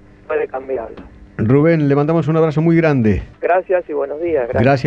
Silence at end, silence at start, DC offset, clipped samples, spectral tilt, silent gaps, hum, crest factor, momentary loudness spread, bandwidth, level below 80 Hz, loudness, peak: 0 s; 0.3 s; under 0.1%; under 0.1%; -9.5 dB/octave; none; none; 14 dB; 10 LU; 7.2 kHz; -38 dBFS; -16 LUFS; -2 dBFS